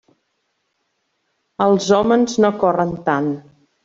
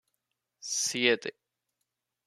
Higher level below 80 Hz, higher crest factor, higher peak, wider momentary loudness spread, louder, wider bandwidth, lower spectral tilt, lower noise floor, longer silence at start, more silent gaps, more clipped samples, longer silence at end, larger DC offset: first, -56 dBFS vs -80 dBFS; second, 18 dB vs 26 dB; first, -2 dBFS vs -8 dBFS; second, 10 LU vs 16 LU; first, -17 LUFS vs -28 LUFS; second, 7.8 kHz vs 14 kHz; first, -5.5 dB/octave vs -1 dB/octave; second, -70 dBFS vs -84 dBFS; first, 1.6 s vs 0.65 s; neither; neither; second, 0.45 s vs 0.95 s; neither